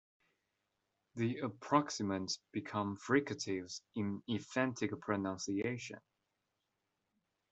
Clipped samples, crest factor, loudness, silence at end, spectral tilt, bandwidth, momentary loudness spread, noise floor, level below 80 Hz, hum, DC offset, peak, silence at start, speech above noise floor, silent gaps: under 0.1%; 24 dB; -38 LUFS; 1.5 s; -5 dB/octave; 8.2 kHz; 8 LU; -86 dBFS; -80 dBFS; none; under 0.1%; -16 dBFS; 1.15 s; 48 dB; none